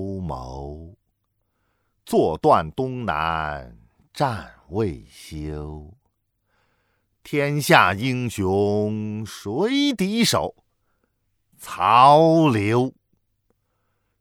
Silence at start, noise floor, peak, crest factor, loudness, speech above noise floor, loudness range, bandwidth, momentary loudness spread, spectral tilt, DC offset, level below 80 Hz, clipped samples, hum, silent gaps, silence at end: 0 s; -73 dBFS; 0 dBFS; 22 dB; -20 LUFS; 52 dB; 11 LU; 18.5 kHz; 20 LU; -5.5 dB/octave; under 0.1%; -48 dBFS; under 0.1%; none; none; 1.3 s